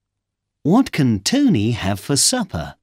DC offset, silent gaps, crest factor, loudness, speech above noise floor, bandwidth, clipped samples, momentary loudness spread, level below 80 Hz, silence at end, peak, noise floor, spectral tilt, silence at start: under 0.1%; none; 16 dB; -18 LUFS; 61 dB; 16.5 kHz; under 0.1%; 8 LU; -46 dBFS; 0.1 s; -4 dBFS; -79 dBFS; -4.5 dB/octave; 0.65 s